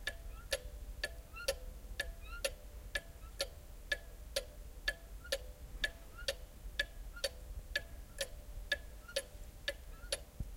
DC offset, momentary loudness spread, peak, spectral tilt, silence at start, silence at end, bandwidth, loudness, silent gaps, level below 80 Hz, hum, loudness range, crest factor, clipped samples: under 0.1%; 11 LU; -20 dBFS; -2 dB/octave; 0 s; 0 s; 16.5 kHz; -43 LUFS; none; -50 dBFS; none; 1 LU; 24 dB; under 0.1%